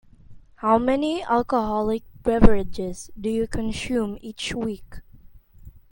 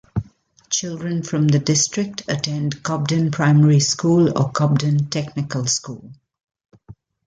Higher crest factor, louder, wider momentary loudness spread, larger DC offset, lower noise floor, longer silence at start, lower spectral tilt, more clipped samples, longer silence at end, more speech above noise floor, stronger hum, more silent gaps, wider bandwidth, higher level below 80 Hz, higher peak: first, 22 dB vs 16 dB; second, -24 LUFS vs -19 LUFS; about the same, 12 LU vs 10 LU; neither; about the same, -47 dBFS vs -49 dBFS; first, 0.3 s vs 0.15 s; about the same, -6 dB/octave vs -5 dB/octave; neither; second, 0.2 s vs 0.35 s; second, 26 dB vs 31 dB; neither; neither; first, 17 kHz vs 9.4 kHz; first, -32 dBFS vs -52 dBFS; first, 0 dBFS vs -4 dBFS